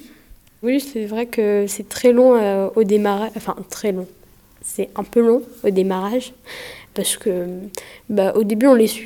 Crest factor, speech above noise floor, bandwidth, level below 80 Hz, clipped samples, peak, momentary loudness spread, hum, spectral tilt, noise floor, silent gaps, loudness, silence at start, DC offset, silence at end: 16 dB; 29 dB; 19.5 kHz; -56 dBFS; under 0.1%; -2 dBFS; 18 LU; none; -5 dB/octave; -47 dBFS; none; -19 LUFS; 0.05 s; under 0.1%; 0 s